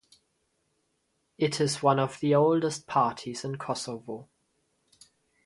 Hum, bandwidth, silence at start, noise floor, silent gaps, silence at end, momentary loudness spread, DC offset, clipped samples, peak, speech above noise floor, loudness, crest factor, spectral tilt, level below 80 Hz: none; 11.5 kHz; 1.4 s; -75 dBFS; none; 1.2 s; 13 LU; under 0.1%; under 0.1%; -8 dBFS; 48 dB; -27 LUFS; 22 dB; -5.5 dB/octave; -70 dBFS